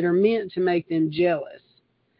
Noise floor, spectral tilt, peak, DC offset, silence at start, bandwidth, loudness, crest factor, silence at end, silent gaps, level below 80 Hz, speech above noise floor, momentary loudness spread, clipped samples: -65 dBFS; -11.5 dB/octave; -8 dBFS; under 0.1%; 0 s; 5.4 kHz; -23 LUFS; 16 dB; 0.6 s; none; -66 dBFS; 43 dB; 7 LU; under 0.1%